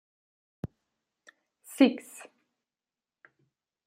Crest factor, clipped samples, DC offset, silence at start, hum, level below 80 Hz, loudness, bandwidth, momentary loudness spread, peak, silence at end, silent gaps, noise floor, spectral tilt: 26 dB; under 0.1%; under 0.1%; 0.65 s; none; -68 dBFS; -26 LUFS; 16 kHz; 23 LU; -8 dBFS; 1.9 s; none; under -90 dBFS; -5 dB/octave